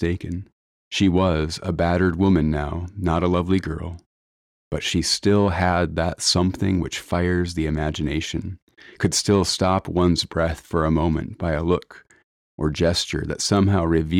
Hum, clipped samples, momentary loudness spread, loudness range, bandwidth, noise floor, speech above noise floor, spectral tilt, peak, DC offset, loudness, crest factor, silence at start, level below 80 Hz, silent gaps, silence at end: none; under 0.1%; 10 LU; 2 LU; 15 kHz; under -90 dBFS; over 69 dB; -5 dB/octave; -8 dBFS; under 0.1%; -22 LUFS; 14 dB; 0 s; -36 dBFS; 0.52-0.91 s, 4.06-4.71 s, 8.62-8.67 s, 12.24-12.58 s; 0 s